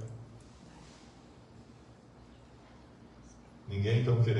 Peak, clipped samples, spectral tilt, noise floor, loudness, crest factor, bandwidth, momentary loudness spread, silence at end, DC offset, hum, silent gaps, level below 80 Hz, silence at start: -18 dBFS; under 0.1%; -8 dB/octave; -56 dBFS; -32 LUFS; 18 dB; 8 kHz; 26 LU; 0 s; under 0.1%; none; none; -62 dBFS; 0 s